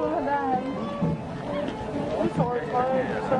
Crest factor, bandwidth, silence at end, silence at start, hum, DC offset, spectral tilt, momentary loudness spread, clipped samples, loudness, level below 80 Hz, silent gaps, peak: 16 dB; 11 kHz; 0 s; 0 s; none; under 0.1%; -7.5 dB/octave; 6 LU; under 0.1%; -27 LUFS; -50 dBFS; none; -12 dBFS